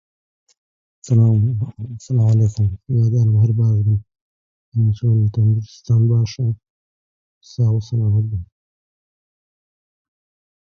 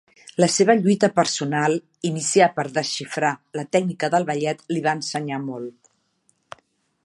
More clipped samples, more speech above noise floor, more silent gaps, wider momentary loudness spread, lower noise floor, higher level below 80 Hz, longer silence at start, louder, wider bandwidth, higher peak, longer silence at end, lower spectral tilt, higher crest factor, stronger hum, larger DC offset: neither; first, over 74 dB vs 45 dB; first, 4.21-4.72 s, 6.70-7.41 s vs none; about the same, 10 LU vs 11 LU; first, under -90 dBFS vs -67 dBFS; first, -42 dBFS vs -70 dBFS; first, 1.05 s vs 0.4 s; first, -18 LUFS vs -21 LUFS; second, 7.4 kHz vs 11.5 kHz; about the same, -4 dBFS vs -2 dBFS; first, 2.15 s vs 1.35 s; first, -9 dB/octave vs -4.5 dB/octave; second, 14 dB vs 20 dB; neither; neither